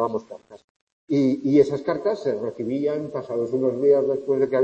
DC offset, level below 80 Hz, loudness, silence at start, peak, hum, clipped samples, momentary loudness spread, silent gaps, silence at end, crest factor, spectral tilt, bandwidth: under 0.1%; -66 dBFS; -23 LUFS; 0 s; -4 dBFS; none; under 0.1%; 10 LU; 0.64-1.08 s; 0 s; 18 dB; -8 dB/octave; 7.8 kHz